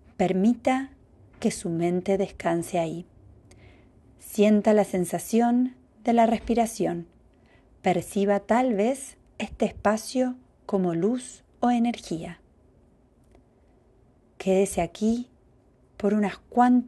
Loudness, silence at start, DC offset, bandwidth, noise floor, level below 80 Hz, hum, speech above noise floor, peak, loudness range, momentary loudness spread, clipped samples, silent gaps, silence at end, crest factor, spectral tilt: -25 LUFS; 0.2 s; under 0.1%; 12.5 kHz; -59 dBFS; -54 dBFS; none; 35 dB; -8 dBFS; 6 LU; 12 LU; under 0.1%; none; 0 s; 18 dB; -6 dB/octave